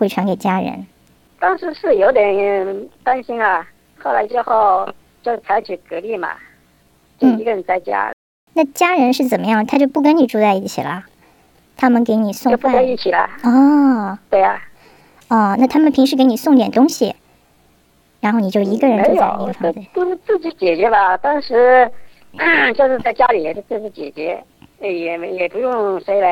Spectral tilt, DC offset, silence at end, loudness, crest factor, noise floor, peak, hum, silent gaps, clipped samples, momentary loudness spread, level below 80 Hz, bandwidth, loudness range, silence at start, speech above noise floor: -5.5 dB/octave; under 0.1%; 0 s; -16 LUFS; 14 dB; -55 dBFS; -2 dBFS; none; 8.13-8.47 s; under 0.1%; 12 LU; -56 dBFS; 18 kHz; 5 LU; 0 s; 40 dB